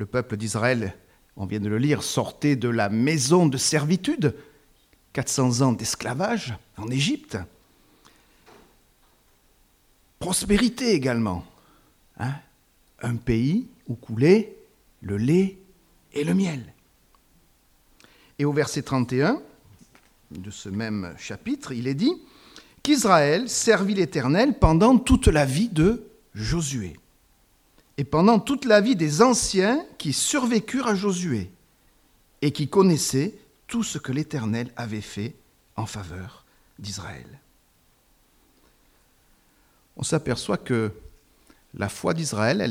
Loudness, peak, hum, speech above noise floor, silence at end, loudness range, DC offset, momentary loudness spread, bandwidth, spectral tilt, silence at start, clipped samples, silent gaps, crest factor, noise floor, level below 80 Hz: -23 LUFS; -2 dBFS; none; 39 dB; 0 s; 12 LU; under 0.1%; 17 LU; 16.5 kHz; -5 dB/octave; 0 s; under 0.1%; none; 22 dB; -62 dBFS; -42 dBFS